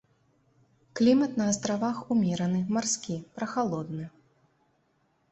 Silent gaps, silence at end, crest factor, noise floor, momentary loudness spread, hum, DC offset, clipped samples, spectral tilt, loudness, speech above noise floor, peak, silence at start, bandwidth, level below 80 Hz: none; 1.25 s; 18 dB; -71 dBFS; 14 LU; none; under 0.1%; under 0.1%; -5 dB/octave; -28 LUFS; 43 dB; -12 dBFS; 0.95 s; 8.4 kHz; -66 dBFS